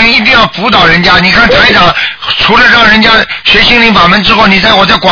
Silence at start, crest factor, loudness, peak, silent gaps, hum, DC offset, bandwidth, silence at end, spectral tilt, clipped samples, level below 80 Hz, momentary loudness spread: 0 s; 4 dB; -3 LUFS; 0 dBFS; none; none; under 0.1%; 5.4 kHz; 0 s; -4.5 dB/octave; 10%; -26 dBFS; 4 LU